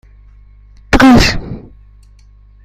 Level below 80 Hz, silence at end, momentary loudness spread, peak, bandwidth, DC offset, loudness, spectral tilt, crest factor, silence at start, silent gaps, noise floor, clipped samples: -24 dBFS; 1.05 s; 23 LU; 0 dBFS; 15.5 kHz; under 0.1%; -9 LUFS; -5 dB/octave; 14 dB; 0.9 s; none; -42 dBFS; under 0.1%